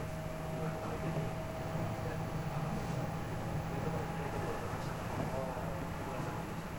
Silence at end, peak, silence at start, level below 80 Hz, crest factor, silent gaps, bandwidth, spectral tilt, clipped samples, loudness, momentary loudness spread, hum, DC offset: 0 s; -24 dBFS; 0 s; -50 dBFS; 14 dB; none; over 20 kHz; -6.5 dB/octave; under 0.1%; -39 LUFS; 2 LU; none; 0.1%